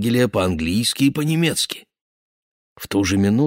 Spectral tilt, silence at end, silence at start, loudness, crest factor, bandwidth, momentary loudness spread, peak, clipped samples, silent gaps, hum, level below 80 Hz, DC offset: -5 dB/octave; 0 s; 0 s; -19 LUFS; 14 dB; 16.5 kHz; 7 LU; -6 dBFS; under 0.1%; 2.01-2.76 s; none; -46 dBFS; under 0.1%